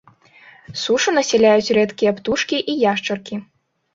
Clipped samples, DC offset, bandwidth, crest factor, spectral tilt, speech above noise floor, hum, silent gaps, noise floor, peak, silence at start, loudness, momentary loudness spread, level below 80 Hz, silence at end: under 0.1%; under 0.1%; 7.8 kHz; 16 dB; -3.5 dB/octave; 30 dB; none; none; -48 dBFS; -2 dBFS; 0.7 s; -18 LUFS; 13 LU; -58 dBFS; 0.5 s